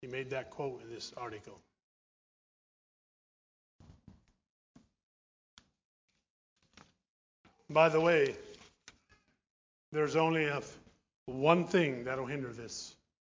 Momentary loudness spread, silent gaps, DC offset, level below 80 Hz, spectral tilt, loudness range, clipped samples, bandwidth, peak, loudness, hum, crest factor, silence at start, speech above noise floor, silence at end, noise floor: 19 LU; 1.83-3.79 s, 4.50-4.75 s, 5.03-5.57 s, 5.85-6.08 s, 6.30-6.56 s, 7.09-7.44 s, 9.50-9.92 s, 11.16-11.26 s; under 0.1%; -72 dBFS; -5.5 dB/octave; 15 LU; under 0.1%; 7.6 kHz; -10 dBFS; -32 LUFS; none; 26 dB; 0 s; 38 dB; 0.5 s; -71 dBFS